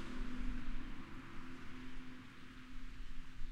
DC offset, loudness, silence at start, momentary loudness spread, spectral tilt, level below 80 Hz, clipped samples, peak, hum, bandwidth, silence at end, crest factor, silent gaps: under 0.1%; -52 LUFS; 0 s; 8 LU; -5.5 dB/octave; -48 dBFS; under 0.1%; -28 dBFS; none; 7.8 kHz; 0 s; 14 dB; none